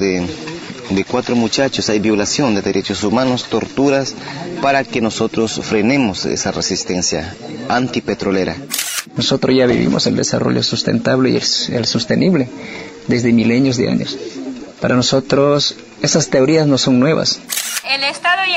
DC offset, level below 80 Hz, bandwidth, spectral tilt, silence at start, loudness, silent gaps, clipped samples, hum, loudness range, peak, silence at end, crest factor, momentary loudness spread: under 0.1%; -48 dBFS; 16 kHz; -4 dB/octave; 0 s; -15 LUFS; none; under 0.1%; none; 3 LU; -2 dBFS; 0 s; 14 dB; 10 LU